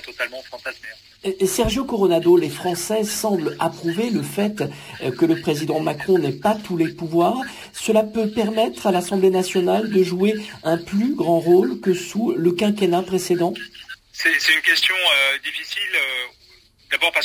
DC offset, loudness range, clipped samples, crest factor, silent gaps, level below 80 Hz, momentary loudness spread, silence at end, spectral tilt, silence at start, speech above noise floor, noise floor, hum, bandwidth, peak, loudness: under 0.1%; 4 LU; under 0.1%; 16 dB; none; -48 dBFS; 13 LU; 0 s; -4.5 dB/octave; 0.05 s; 32 dB; -52 dBFS; none; 16 kHz; -4 dBFS; -20 LUFS